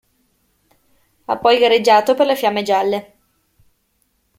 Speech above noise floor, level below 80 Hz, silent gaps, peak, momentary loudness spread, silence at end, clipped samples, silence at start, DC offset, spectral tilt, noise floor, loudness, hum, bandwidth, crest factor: 50 dB; -62 dBFS; none; 0 dBFS; 12 LU; 1.35 s; under 0.1%; 1.3 s; under 0.1%; -3.5 dB/octave; -65 dBFS; -15 LUFS; none; 16.5 kHz; 18 dB